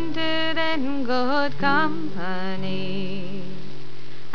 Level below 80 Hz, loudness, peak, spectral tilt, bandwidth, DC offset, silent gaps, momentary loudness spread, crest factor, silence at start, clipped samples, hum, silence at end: -64 dBFS; -25 LUFS; -6 dBFS; -6 dB/octave; 5.4 kHz; 10%; none; 18 LU; 20 dB; 0 s; under 0.1%; none; 0 s